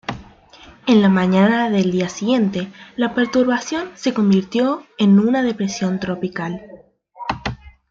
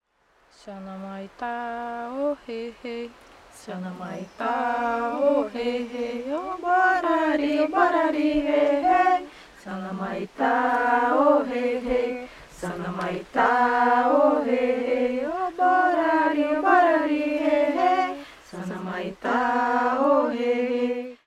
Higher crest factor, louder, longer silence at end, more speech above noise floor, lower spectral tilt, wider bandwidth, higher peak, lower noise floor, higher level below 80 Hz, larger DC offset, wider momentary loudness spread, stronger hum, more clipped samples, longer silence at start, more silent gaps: about the same, 16 dB vs 18 dB; first, -18 LUFS vs -23 LUFS; about the same, 0.2 s vs 0.1 s; second, 28 dB vs 40 dB; about the same, -6 dB/octave vs -6 dB/octave; second, 7.6 kHz vs 12.5 kHz; first, -2 dBFS vs -6 dBFS; second, -45 dBFS vs -63 dBFS; first, -50 dBFS vs -56 dBFS; neither; about the same, 14 LU vs 16 LU; neither; neither; second, 0.1 s vs 0.65 s; neither